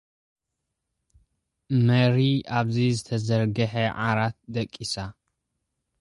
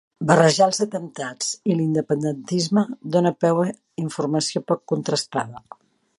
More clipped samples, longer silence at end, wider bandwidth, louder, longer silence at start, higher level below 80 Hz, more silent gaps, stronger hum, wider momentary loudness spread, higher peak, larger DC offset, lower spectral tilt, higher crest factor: neither; first, 0.9 s vs 0.6 s; about the same, 11.5 kHz vs 11.5 kHz; second, -25 LUFS vs -22 LUFS; first, 1.7 s vs 0.2 s; first, -56 dBFS vs -66 dBFS; neither; neither; about the same, 11 LU vs 12 LU; second, -8 dBFS vs 0 dBFS; neither; first, -6.5 dB/octave vs -5 dB/octave; about the same, 18 dB vs 22 dB